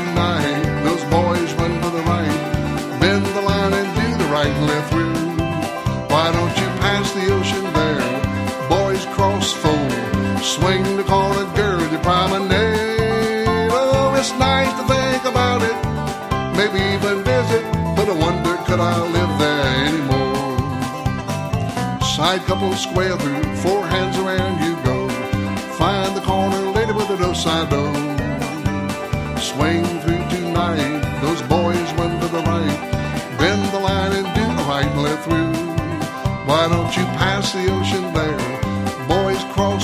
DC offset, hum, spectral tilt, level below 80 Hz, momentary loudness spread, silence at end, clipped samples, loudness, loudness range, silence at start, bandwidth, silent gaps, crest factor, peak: under 0.1%; none; -5.5 dB/octave; -34 dBFS; 5 LU; 0 s; under 0.1%; -19 LUFS; 3 LU; 0 s; 16 kHz; none; 18 dB; 0 dBFS